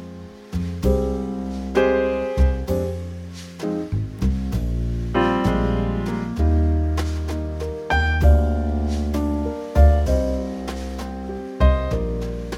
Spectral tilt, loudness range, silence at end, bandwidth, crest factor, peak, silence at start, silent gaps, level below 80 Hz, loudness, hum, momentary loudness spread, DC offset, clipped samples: -7.5 dB/octave; 3 LU; 0 s; 12 kHz; 16 dB; -4 dBFS; 0 s; none; -24 dBFS; -22 LUFS; none; 13 LU; under 0.1%; under 0.1%